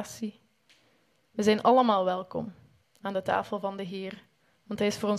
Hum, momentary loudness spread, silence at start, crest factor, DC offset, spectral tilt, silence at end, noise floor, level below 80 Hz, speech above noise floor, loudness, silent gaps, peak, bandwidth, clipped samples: none; 19 LU; 0 s; 22 dB; under 0.1%; -5 dB/octave; 0 s; -68 dBFS; -66 dBFS; 40 dB; -28 LUFS; none; -8 dBFS; 14.5 kHz; under 0.1%